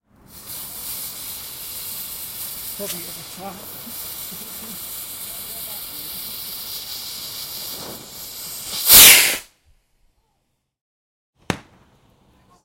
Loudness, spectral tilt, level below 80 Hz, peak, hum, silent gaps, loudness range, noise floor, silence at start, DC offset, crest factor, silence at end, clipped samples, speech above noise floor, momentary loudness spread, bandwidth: -16 LUFS; 0.5 dB/octave; -50 dBFS; 0 dBFS; none; 10.81-11.33 s; 16 LU; -71 dBFS; 0.3 s; under 0.1%; 22 dB; 1.05 s; under 0.1%; 39 dB; 20 LU; 16.5 kHz